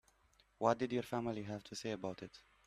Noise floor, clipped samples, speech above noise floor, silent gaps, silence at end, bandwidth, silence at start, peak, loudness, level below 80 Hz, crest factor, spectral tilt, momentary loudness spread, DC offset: -73 dBFS; under 0.1%; 33 dB; none; 0.25 s; 14.5 kHz; 0.6 s; -18 dBFS; -40 LUFS; -72 dBFS; 24 dB; -5.5 dB/octave; 11 LU; under 0.1%